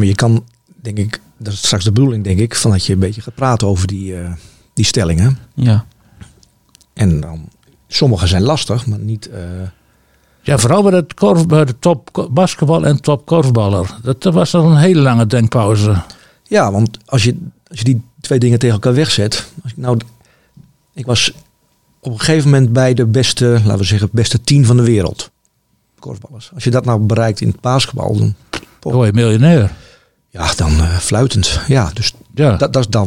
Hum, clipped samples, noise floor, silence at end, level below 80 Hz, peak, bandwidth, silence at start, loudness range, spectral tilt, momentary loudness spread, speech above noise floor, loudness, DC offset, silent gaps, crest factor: none; under 0.1%; -61 dBFS; 0 s; -34 dBFS; 0 dBFS; 14.5 kHz; 0 s; 5 LU; -5.5 dB/octave; 15 LU; 49 dB; -13 LUFS; 0.4%; none; 14 dB